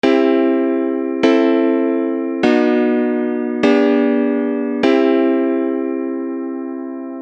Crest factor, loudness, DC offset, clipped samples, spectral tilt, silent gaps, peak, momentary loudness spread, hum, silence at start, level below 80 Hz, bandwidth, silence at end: 14 dB; -16 LUFS; under 0.1%; under 0.1%; -6 dB/octave; none; -2 dBFS; 9 LU; none; 0.05 s; -64 dBFS; 7.6 kHz; 0 s